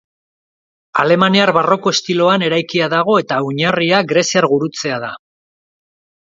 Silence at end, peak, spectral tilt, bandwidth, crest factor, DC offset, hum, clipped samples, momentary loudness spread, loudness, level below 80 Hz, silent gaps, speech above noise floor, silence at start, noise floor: 1.1 s; 0 dBFS; -4.5 dB/octave; 7.8 kHz; 16 dB; under 0.1%; none; under 0.1%; 9 LU; -14 LUFS; -60 dBFS; none; over 76 dB; 0.95 s; under -90 dBFS